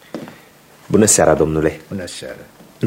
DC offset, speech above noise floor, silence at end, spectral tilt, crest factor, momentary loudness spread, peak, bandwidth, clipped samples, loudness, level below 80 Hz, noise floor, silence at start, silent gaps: under 0.1%; 30 dB; 0 s; -4 dB/octave; 18 dB; 22 LU; 0 dBFS; 16.5 kHz; under 0.1%; -14 LUFS; -40 dBFS; -46 dBFS; 0.15 s; none